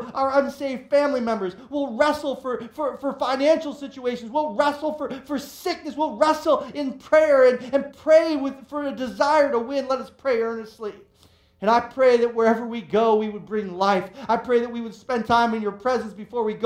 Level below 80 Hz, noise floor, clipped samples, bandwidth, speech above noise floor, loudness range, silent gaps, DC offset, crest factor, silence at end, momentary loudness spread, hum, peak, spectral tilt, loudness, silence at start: -60 dBFS; -57 dBFS; under 0.1%; 16 kHz; 35 dB; 5 LU; none; under 0.1%; 18 dB; 0 s; 12 LU; none; -4 dBFS; -5 dB/octave; -22 LUFS; 0 s